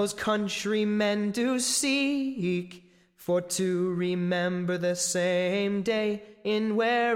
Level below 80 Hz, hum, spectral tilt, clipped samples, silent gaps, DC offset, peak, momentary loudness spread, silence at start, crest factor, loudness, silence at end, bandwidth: -66 dBFS; none; -4 dB/octave; under 0.1%; none; under 0.1%; -14 dBFS; 6 LU; 0 s; 14 dB; -27 LUFS; 0 s; 16.5 kHz